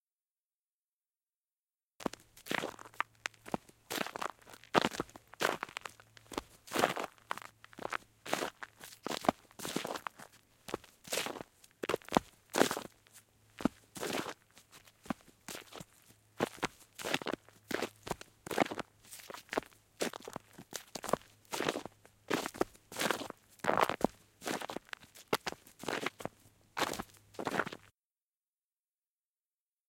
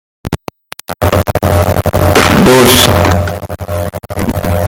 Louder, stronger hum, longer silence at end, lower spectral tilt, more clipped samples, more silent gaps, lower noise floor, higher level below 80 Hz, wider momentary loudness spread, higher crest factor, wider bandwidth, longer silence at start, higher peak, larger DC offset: second, -39 LUFS vs -10 LUFS; neither; first, 2.05 s vs 0 s; second, -3 dB/octave vs -4.5 dB/octave; second, under 0.1% vs 0.2%; neither; first, under -90 dBFS vs -29 dBFS; second, -68 dBFS vs -28 dBFS; about the same, 16 LU vs 17 LU; first, 32 dB vs 10 dB; second, 17 kHz vs over 20 kHz; first, 2 s vs 0.25 s; second, -8 dBFS vs 0 dBFS; neither